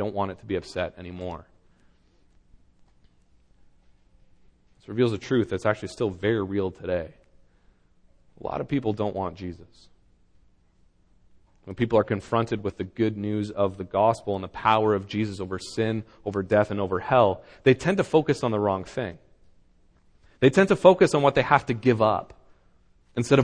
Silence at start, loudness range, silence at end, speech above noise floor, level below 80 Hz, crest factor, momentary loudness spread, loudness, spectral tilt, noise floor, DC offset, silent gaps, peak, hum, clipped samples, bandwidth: 0 s; 12 LU; 0 s; 37 dB; -54 dBFS; 24 dB; 13 LU; -25 LUFS; -6.5 dB/octave; -61 dBFS; under 0.1%; none; -2 dBFS; none; under 0.1%; 10.5 kHz